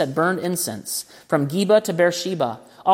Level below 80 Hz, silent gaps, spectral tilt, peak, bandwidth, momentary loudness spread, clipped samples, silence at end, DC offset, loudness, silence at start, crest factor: -68 dBFS; none; -4.5 dB/octave; -4 dBFS; 16.5 kHz; 9 LU; under 0.1%; 0 s; under 0.1%; -21 LUFS; 0 s; 16 dB